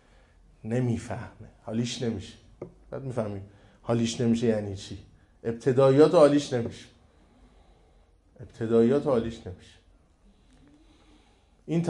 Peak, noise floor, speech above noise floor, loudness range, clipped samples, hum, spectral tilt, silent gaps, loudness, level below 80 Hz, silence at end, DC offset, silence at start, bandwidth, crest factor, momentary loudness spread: -6 dBFS; -61 dBFS; 35 dB; 9 LU; under 0.1%; none; -6.5 dB/octave; none; -26 LUFS; -58 dBFS; 0 s; under 0.1%; 0.65 s; 11 kHz; 22 dB; 25 LU